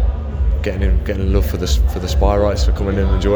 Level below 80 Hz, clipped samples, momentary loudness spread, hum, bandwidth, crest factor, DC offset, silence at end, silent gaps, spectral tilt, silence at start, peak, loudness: -16 dBFS; under 0.1%; 4 LU; none; over 20 kHz; 16 dB; under 0.1%; 0 s; none; -6.5 dB/octave; 0 s; 0 dBFS; -18 LUFS